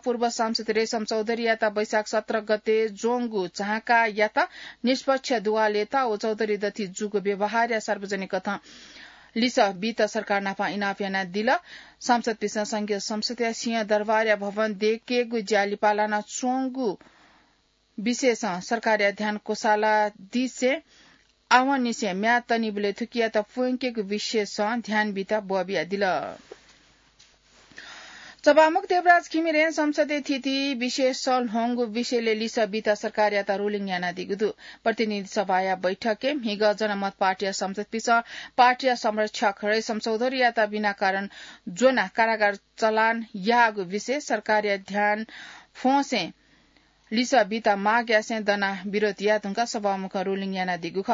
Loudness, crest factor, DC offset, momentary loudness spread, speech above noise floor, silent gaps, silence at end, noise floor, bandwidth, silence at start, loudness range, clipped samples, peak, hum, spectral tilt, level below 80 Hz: -25 LUFS; 20 dB; under 0.1%; 8 LU; 41 dB; none; 0 s; -66 dBFS; 7.8 kHz; 0.05 s; 4 LU; under 0.1%; -6 dBFS; none; -4 dB/octave; -70 dBFS